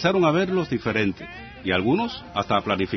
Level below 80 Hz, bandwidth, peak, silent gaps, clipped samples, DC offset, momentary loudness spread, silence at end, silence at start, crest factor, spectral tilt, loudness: -52 dBFS; 6.2 kHz; -6 dBFS; none; under 0.1%; under 0.1%; 10 LU; 0 s; 0 s; 18 dB; -6.5 dB/octave; -23 LUFS